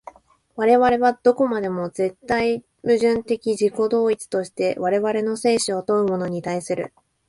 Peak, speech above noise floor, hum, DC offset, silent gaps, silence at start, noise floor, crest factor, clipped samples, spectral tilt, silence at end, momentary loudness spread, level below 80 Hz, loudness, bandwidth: -4 dBFS; 25 dB; none; under 0.1%; none; 0.55 s; -45 dBFS; 18 dB; under 0.1%; -5 dB/octave; 0.4 s; 9 LU; -58 dBFS; -21 LUFS; 11.5 kHz